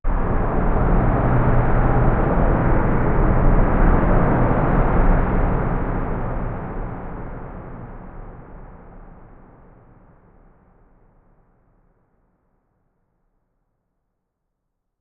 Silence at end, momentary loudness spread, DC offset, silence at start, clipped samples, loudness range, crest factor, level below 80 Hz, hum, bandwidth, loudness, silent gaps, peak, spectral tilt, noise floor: 5.75 s; 19 LU; under 0.1%; 0.05 s; under 0.1%; 19 LU; 18 dB; -22 dBFS; none; 3.2 kHz; -20 LUFS; none; -2 dBFS; -9 dB/octave; -76 dBFS